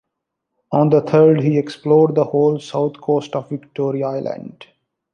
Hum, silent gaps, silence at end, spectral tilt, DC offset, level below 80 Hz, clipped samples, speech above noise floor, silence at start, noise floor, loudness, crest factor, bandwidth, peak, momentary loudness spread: none; none; 0.5 s; -8.5 dB/octave; under 0.1%; -64 dBFS; under 0.1%; 62 dB; 0.7 s; -78 dBFS; -17 LUFS; 16 dB; 8.6 kHz; -2 dBFS; 13 LU